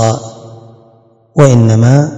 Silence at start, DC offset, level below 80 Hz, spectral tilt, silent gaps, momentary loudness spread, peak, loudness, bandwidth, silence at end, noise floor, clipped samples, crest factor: 0 s; under 0.1%; -44 dBFS; -7 dB/octave; none; 14 LU; 0 dBFS; -9 LUFS; 9 kHz; 0 s; -46 dBFS; 3%; 10 dB